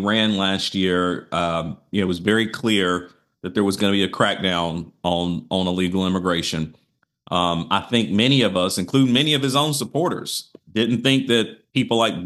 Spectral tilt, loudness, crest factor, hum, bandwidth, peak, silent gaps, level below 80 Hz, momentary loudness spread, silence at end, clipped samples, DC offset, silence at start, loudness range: -4.5 dB/octave; -21 LUFS; 18 dB; none; 12.5 kHz; -2 dBFS; none; -54 dBFS; 9 LU; 0 s; under 0.1%; under 0.1%; 0 s; 3 LU